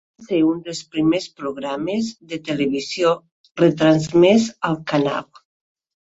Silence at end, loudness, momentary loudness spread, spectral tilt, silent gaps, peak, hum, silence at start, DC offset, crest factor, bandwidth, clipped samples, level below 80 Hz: 0.9 s; -20 LUFS; 13 LU; -6 dB/octave; 3.32-3.44 s, 3.51-3.55 s; -2 dBFS; none; 0.2 s; under 0.1%; 18 dB; 8 kHz; under 0.1%; -58 dBFS